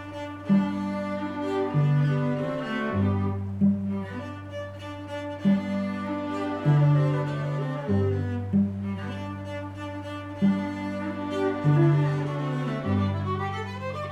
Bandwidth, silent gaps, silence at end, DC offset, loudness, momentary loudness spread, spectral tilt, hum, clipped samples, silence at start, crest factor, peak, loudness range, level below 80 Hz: 8.2 kHz; none; 0 s; under 0.1%; -27 LUFS; 13 LU; -8.5 dB/octave; none; under 0.1%; 0 s; 14 dB; -12 dBFS; 3 LU; -62 dBFS